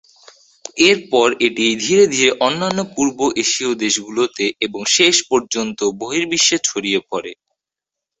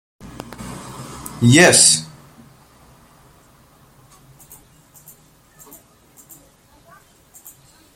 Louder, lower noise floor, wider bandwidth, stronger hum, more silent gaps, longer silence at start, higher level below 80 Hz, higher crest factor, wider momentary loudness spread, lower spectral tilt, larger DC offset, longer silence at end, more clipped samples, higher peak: second, -16 LUFS vs -11 LUFS; first, -85 dBFS vs -51 dBFS; second, 8.4 kHz vs 16.5 kHz; neither; neither; first, 0.75 s vs 0.6 s; second, -60 dBFS vs -52 dBFS; about the same, 18 dB vs 22 dB; second, 9 LU vs 28 LU; about the same, -2 dB/octave vs -3 dB/octave; neither; second, 0.85 s vs 5.9 s; neither; about the same, 0 dBFS vs 0 dBFS